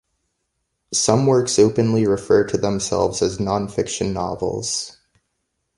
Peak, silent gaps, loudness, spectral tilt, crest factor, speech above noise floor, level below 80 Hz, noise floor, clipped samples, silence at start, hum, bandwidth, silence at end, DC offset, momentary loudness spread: 0 dBFS; none; -19 LUFS; -5 dB/octave; 20 dB; 55 dB; -46 dBFS; -74 dBFS; under 0.1%; 0.9 s; none; 11.5 kHz; 0.85 s; under 0.1%; 8 LU